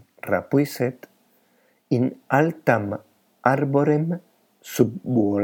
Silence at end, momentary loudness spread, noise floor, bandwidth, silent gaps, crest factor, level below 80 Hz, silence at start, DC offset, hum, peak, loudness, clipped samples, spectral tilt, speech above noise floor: 0 s; 8 LU; -63 dBFS; 19 kHz; none; 22 dB; -72 dBFS; 0.25 s; under 0.1%; none; -2 dBFS; -23 LUFS; under 0.1%; -7.5 dB/octave; 42 dB